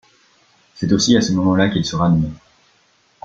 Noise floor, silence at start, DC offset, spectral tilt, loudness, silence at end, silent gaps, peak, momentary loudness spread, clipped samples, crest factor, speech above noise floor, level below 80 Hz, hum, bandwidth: -58 dBFS; 0.75 s; under 0.1%; -5.5 dB/octave; -17 LUFS; 0.9 s; none; 0 dBFS; 7 LU; under 0.1%; 18 dB; 42 dB; -44 dBFS; none; 7.8 kHz